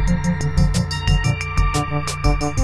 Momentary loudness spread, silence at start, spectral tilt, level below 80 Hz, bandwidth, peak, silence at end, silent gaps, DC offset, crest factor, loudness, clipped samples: 2 LU; 0 s; -5.5 dB/octave; -22 dBFS; 12.5 kHz; -4 dBFS; 0 s; none; under 0.1%; 14 dB; -20 LUFS; under 0.1%